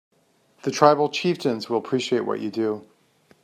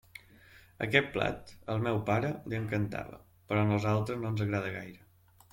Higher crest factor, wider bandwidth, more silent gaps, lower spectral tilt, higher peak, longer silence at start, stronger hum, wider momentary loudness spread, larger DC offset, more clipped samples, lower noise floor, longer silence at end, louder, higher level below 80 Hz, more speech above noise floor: about the same, 22 dB vs 24 dB; second, 14 kHz vs 16 kHz; neither; second, -5 dB/octave vs -7 dB/octave; first, -2 dBFS vs -8 dBFS; first, 0.65 s vs 0.15 s; neither; second, 11 LU vs 15 LU; neither; neither; first, -62 dBFS vs -58 dBFS; about the same, 0.6 s vs 0.55 s; first, -23 LUFS vs -32 LUFS; second, -72 dBFS vs -60 dBFS; first, 40 dB vs 26 dB